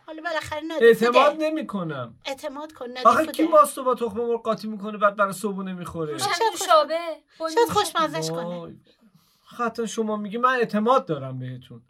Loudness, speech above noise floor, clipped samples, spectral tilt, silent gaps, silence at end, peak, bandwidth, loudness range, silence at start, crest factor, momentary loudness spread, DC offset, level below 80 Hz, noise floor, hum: -23 LUFS; 34 dB; under 0.1%; -4.5 dB/octave; none; 0.1 s; -2 dBFS; 16 kHz; 5 LU; 0.1 s; 20 dB; 15 LU; under 0.1%; -64 dBFS; -57 dBFS; none